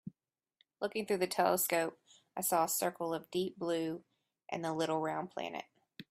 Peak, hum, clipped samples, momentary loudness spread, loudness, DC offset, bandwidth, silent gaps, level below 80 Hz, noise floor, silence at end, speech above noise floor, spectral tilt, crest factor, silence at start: -16 dBFS; none; under 0.1%; 16 LU; -35 LUFS; under 0.1%; 16 kHz; none; -80 dBFS; -78 dBFS; 0.1 s; 43 dB; -3.5 dB/octave; 20 dB; 0.05 s